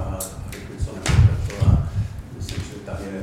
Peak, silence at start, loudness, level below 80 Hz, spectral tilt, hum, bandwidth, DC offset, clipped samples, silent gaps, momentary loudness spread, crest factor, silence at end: -4 dBFS; 0 s; -23 LUFS; -28 dBFS; -6 dB/octave; none; 14.5 kHz; under 0.1%; under 0.1%; none; 15 LU; 18 dB; 0 s